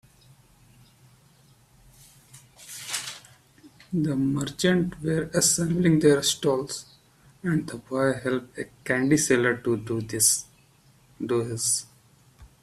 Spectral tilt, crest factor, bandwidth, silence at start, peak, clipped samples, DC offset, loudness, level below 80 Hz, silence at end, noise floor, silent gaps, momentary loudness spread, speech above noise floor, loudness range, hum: -4 dB/octave; 20 dB; 15.5 kHz; 2.35 s; -8 dBFS; under 0.1%; under 0.1%; -24 LUFS; -58 dBFS; 0.2 s; -58 dBFS; none; 14 LU; 34 dB; 15 LU; none